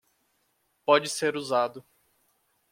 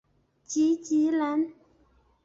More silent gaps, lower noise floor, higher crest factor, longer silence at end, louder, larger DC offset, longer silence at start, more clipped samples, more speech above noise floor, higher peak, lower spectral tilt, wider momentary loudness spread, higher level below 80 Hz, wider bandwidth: neither; first, -73 dBFS vs -64 dBFS; first, 22 dB vs 12 dB; first, 0.9 s vs 0.7 s; about the same, -26 LUFS vs -27 LUFS; neither; first, 0.9 s vs 0.5 s; neither; first, 47 dB vs 39 dB; first, -6 dBFS vs -16 dBFS; about the same, -3 dB/octave vs -4 dB/octave; about the same, 9 LU vs 8 LU; second, -78 dBFS vs -70 dBFS; first, 16 kHz vs 7.8 kHz